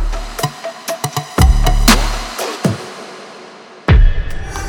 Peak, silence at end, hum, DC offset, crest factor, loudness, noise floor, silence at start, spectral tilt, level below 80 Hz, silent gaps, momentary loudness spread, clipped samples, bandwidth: 0 dBFS; 0 s; none; under 0.1%; 14 dB; -16 LUFS; -36 dBFS; 0 s; -4.5 dB/octave; -16 dBFS; none; 19 LU; under 0.1%; 19.5 kHz